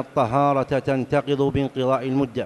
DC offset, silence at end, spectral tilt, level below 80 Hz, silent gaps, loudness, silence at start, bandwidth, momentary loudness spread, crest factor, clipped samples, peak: under 0.1%; 0 s; -7.5 dB/octave; -50 dBFS; none; -22 LUFS; 0 s; 11.5 kHz; 3 LU; 14 dB; under 0.1%; -6 dBFS